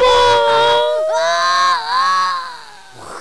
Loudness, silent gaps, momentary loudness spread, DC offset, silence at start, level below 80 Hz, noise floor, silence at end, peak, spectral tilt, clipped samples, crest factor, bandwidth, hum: -14 LUFS; none; 15 LU; 1%; 0 s; -46 dBFS; -37 dBFS; 0 s; -6 dBFS; -1 dB/octave; under 0.1%; 8 dB; 11 kHz; none